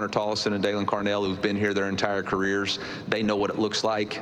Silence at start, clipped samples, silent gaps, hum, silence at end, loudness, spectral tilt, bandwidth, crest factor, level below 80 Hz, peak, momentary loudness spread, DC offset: 0 s; under 0.1%; none; none; 0 s; -26 LUFS; -4.5 dB/octave; 12 kHz; 20 dB; -58 dBFS; -6 dBFS; 2 LU; under 0.1%